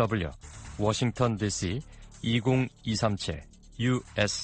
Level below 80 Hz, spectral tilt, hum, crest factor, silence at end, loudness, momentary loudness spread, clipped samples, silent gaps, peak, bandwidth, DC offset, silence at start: -48 dBFS; -5 dB/octave; none; 18 dB; 0 s; -29 LUFS; 15 LU; under 0.1%; none; -10 dBFS; 9.2 kHz; under 0.1%; 0 s